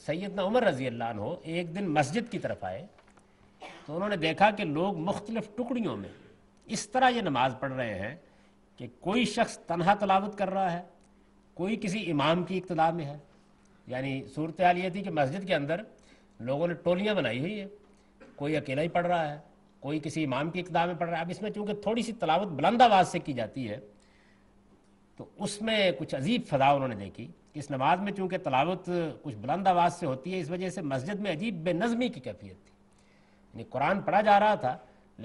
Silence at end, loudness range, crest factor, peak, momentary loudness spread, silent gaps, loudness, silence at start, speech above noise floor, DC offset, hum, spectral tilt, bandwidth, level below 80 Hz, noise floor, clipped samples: 0 s; 5 LU; 24 dB; -6 dBFS; 15 LU; none; -29 LUFS; 0 s; 32 dB; under 0.1%; none; -5.5 dB/octave; 11.5 kHz; -62 dBFS; -61 dBFS; under 0.1%